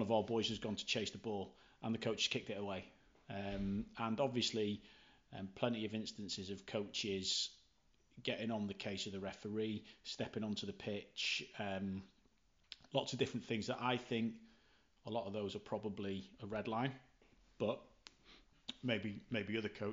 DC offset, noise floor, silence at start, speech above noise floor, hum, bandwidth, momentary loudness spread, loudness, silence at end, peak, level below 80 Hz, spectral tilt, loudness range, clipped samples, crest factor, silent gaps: under 0.1%; -75 dBFS; 0 s; 34 dB; none; 7.8 kHz; 11 LU; -42 LUFS; 0 s; -20 dBFS; -68 dBFS; -4.5 dB/octave; 3 LU; under 0.1%; 22 dB; none